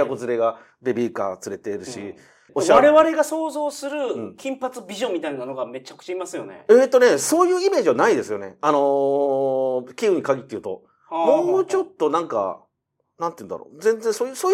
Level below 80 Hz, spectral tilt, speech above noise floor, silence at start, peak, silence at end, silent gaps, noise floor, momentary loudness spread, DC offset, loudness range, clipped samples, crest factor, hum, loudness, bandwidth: -66 dBFS; -4 dB/octave; 54 dB; 0 s; 0 dBFS; 0 s; none; -74 dBFS; 16 LU; under 0.1%; 5 LU; under 0.1%; 20 dB; none; -21 LUFS; 16.5 kHz